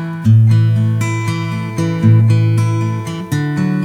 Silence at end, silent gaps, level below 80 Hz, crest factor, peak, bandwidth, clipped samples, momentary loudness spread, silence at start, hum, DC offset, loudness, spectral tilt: 0 s; none; -50 dBFS; 12 dB; 0 dBFS; 10.5 kHz; under 0.1%; 9 LU; 0 s; none; under 0.1%; -14 LUFS; -7.5 dB/octave